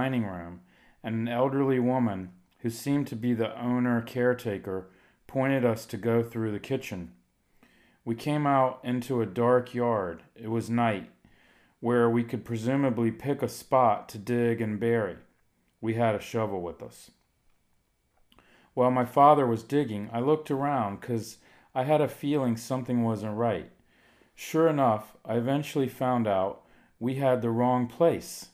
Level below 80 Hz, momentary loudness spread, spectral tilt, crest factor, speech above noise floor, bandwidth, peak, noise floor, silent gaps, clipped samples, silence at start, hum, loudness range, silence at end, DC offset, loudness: -66 dBFS; 12 LU; -7 dB/octave; 22 dB; 44 dB; 16 kHz; -6 dBFS; -71 dBFS; none; under 0.1%; 0 s; none; 5 LU; 0.05 s; under 0.1%; -28 LUFS